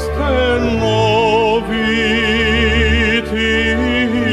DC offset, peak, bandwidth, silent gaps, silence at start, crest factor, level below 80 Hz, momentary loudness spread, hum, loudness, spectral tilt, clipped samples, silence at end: under 0.1%; -2 dBFS; 12.5 kHz; none; 0 s; 12 dB; -24 dBFS; 3 LU; none; -14 LUFS; -5.5 dB/octave; under 0.1%; 0 s